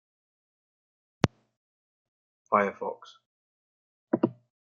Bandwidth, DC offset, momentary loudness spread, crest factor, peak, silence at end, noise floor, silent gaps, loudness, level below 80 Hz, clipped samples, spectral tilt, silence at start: 7.4 kHz; under 0.1%; 11 LU; 30 dB; -2 dBFS; 0.3 s; under -90 dBFS; 1.57-2.45 s, 3.26-4.07 s; -30 LUFS; -66 dBFS; under 0.1%; -5.5 dB/octave; 1.25 s